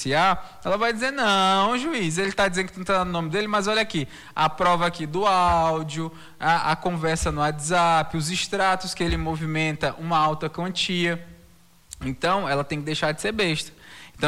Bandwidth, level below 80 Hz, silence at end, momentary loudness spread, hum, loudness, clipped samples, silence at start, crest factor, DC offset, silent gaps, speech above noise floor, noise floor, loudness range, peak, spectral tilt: 16 kHz; -44 dBFS; 0 s; 8 LU; none; -23 LUFS; under 0.1%; 0 s; 14 dB; under 0.1%; none; 31 dB; -55 dBFS; 3 LU; -10 dBFS; -4 dB/octave